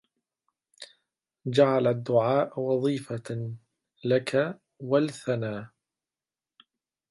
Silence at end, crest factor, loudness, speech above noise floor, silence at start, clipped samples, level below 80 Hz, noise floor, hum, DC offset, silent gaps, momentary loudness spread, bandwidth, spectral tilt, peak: 1.45 s; 20 dB; -27 LUFS; over 64 dB; 0.8 s; under 0.1%; -72 dBFS; under -90 dBFS; none; under 0.1%; none; 20 LU; 11.5 kHz; -7 dB/octave; -8 dBFS